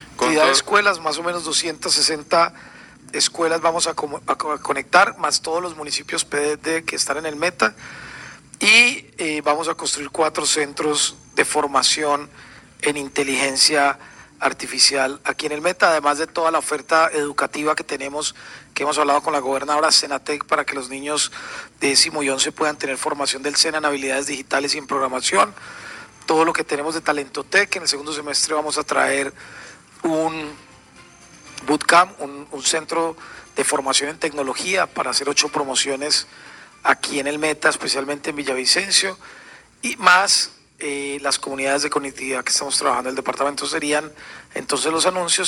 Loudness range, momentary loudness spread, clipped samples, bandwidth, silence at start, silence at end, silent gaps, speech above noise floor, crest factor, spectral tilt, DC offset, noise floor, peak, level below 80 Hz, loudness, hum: 3 LU; 12 LU; under 0.1%; 16 kHz; 0 s; 0 s; none; 26 dB; 20 dB; -1 dB/octave; under 0.1%; -47 dBFS; 0 dBFS; -60 dBFS; -19 LUFS; none